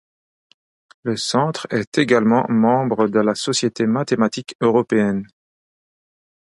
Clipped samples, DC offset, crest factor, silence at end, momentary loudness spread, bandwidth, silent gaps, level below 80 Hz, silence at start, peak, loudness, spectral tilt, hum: under 0.1%; under 0.1%; 18 dB; 1.35 s; 7 LU; 11.5 kHz; 1.87-1.92 s, 4.55-4.59 s; -62 dBFS; 1.05 s; -2 dBFS; -19 LUFS; -5 dB/octave; none